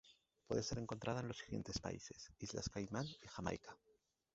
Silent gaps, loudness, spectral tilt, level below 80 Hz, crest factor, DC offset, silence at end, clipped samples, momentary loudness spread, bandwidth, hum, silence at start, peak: none; -46 LUFS; -5 dB/octave; -64 dBFS; 22 dB; under 0.1%; 0.6 s; under 0.1%; 9 LU; 8 kHz; none; 0.05 s; -26 dBFS